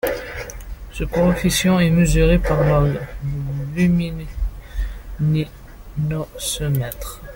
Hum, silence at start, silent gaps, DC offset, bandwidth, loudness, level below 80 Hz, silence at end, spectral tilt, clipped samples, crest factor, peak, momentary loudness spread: none; 0.05 s; none; under 0.1%; 17 kHz; -20 LUFS; -28 dBFS; 0 s; -6 dB/octave; under 0.1%; 16 dB; -4 dBFS; 15 LU